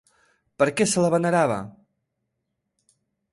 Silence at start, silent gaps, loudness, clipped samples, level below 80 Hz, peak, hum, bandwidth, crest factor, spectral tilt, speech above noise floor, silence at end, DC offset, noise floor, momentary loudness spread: 0.6 s; none; -22 LUFS; under 0.1%; -64 dBFS; -8 dBFS; none; 11.5 kHz; 18 dB; -5 dB/octave; 58 dB; 1.65 s; under 0.1%; -79 dBFS; 9 LU